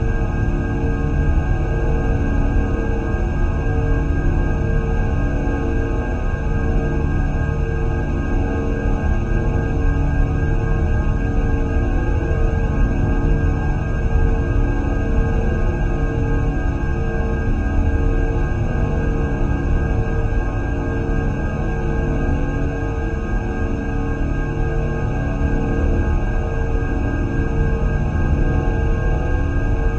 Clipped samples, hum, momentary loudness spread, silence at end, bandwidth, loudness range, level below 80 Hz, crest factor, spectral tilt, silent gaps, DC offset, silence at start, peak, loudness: under 0.1%; none; 3 LU; 0 s; 7 kHz; 2 LU; -20 dBFS; 12 dB; -8.5 dB/octave; none; under 0.1%; 0 s; -4 dBFS; -21 LUFS